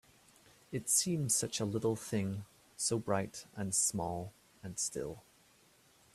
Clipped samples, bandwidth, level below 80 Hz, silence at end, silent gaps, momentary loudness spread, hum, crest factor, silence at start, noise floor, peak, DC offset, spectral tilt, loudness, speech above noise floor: under 0.1%; 15.5 kHz; -68 dBFS; 0.95 s; none; 15 LU; none; 20 dB; 0.7 s; -66 dBFS; -18 dBFS; under 0.1%; -3.5 dB/octave; -35 LUFS; 31 dB